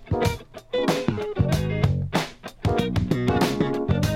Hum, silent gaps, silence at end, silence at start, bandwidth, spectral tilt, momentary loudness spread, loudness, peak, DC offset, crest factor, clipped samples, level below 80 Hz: none; none; 0 s; 0 s; 16.5 kHz; -6.5 dB/octave; 6 LU; -24 LUFS; -6 dBFS; under 0.1%; 18 dB; under 0.1%; -38 dBFS